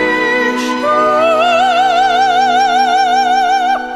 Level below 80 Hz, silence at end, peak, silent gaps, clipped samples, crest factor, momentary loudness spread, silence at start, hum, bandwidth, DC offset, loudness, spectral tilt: -50 dBFS; 0 s; -2 dBFS; none; under 0.1%; 10 dB; 3 LU; 0 s; none; 12.5 kHz; under 0.1%; -11 LUFS; -2.5 dB/octave